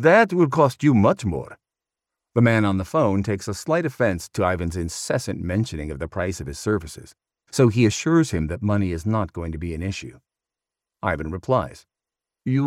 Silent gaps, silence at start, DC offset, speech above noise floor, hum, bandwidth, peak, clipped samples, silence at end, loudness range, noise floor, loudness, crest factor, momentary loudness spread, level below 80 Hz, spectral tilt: none; 0 s; under 0.1%; 67 dB; none; 15 kHz; -4 dBFS; under 0.1%; 0 s; 6 LU; -89 dBFS; -22 LUFS; 18 dB; 12 LU; -44 dBFS; -6.5 dB/octave